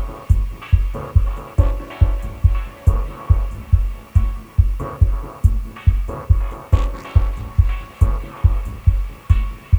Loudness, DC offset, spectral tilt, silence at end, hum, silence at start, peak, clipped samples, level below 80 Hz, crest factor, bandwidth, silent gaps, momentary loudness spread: -20 LUFS; under 0.1%; -8 dB/octave; 0 s; none; 0 s; -2 dBFS; under 0.1%; -20 dBFS; 16 dB; 8 kHz; none; 1 LU